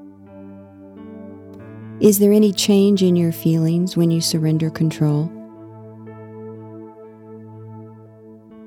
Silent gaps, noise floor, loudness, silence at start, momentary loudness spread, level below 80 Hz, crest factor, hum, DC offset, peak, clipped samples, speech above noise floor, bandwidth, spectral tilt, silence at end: none; -43 dBFS; -17 LUFS; 0 s; 25 LU; -60 dBFS; 18 dB; none; under 0.1%; -2 dBFS; under 0.1%; 27 dB; 18 kHz; -6 dB/octave; 0 s